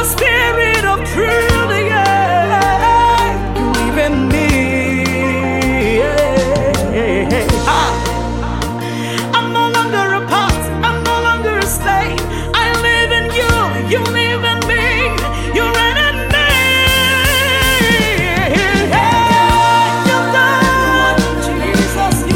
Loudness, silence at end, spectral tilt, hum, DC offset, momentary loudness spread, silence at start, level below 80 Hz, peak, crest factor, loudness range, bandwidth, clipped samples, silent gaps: -13 LUFS; 0 s; -4 dB/octave; none; under 0.1%; 6 LU; 0 s; -24 dBFS; 0 dBFS; 12 dB; 4 LU; 17 kHz; under 0.1%; none